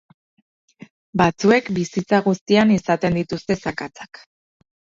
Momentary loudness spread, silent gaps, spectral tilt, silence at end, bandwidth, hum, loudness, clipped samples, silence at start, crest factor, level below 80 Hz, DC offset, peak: 15 LU; 2.41-2.46 s; -6 dB/octave; 0.9 s; 7.6 kHz; none; -19 LUFS; under 0.1%; 1.15 s; 18 dB; -52 dBFS; under 0.1%; -2 dBFS